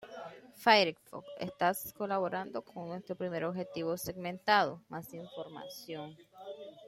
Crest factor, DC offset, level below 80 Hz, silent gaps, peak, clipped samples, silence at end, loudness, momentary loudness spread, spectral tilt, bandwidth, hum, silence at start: 26 dB; under 0.1%; -72 dBFS; none; -10 dBFS; under 0.1%; 0 s; -33 LUFS; 21 LU; -4 dB/octave; 16.5 kHz; none; 0 s